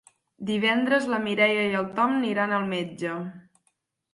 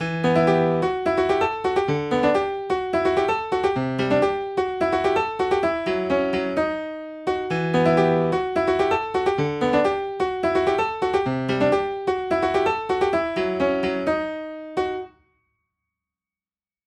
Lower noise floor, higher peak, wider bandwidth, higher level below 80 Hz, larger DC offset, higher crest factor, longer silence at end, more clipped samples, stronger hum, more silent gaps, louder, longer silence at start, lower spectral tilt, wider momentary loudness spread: second, -73 dBFS vs under -90 dBFS; about the same, -8 dBFS vs -6 dBFS; about the same, 11.5 kHz vs 10.5 kHz; second, -70 dBFS vs -50 dBFS; neither; about the same, 20 dB vs 16 dB; second, 0.75 s vs 1.8 s; neither; neither; neither; second, -25 LUFS vs -22 LUFS; first, 0.4 s vs 0 s; about the same, -5.5 dB/octave vs -6.5 dB/octave; first, 10 LU vs 6 LU